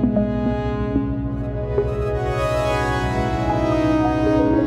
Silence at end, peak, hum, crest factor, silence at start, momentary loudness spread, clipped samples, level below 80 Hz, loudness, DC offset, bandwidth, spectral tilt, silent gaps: 0 s; -6 dBFS; none; 14 dB; 0 s; 5 LU; under 0.1%; -30 dBFS; -21 LUFS; under 0.1%; 13 kHz; -7.5 dB/octave; none